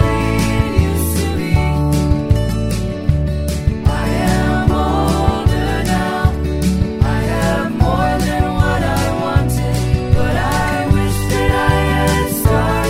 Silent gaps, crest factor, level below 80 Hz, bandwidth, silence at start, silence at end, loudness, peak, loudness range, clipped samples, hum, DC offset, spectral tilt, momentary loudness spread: none; 14 dB; -22 dBFS; 16 kHz; 0 s; 0 s; -16 LUFS; 0 dBFS; 1 LU; under 0.1%; none; under 0.1%; -6 dB/octave; 3 LU